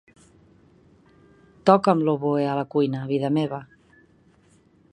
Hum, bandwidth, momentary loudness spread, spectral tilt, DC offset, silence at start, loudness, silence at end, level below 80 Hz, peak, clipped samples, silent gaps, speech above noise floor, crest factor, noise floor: none; 10.5 kHz; 7 LU; -8 dB/octave; under 0.1%; 1.65 s; -22 LUFS; 1.3 s; -66 dBFS; 0 dBFS; under 0.1%; none; 37 dB; 24 dB; -58 dBFS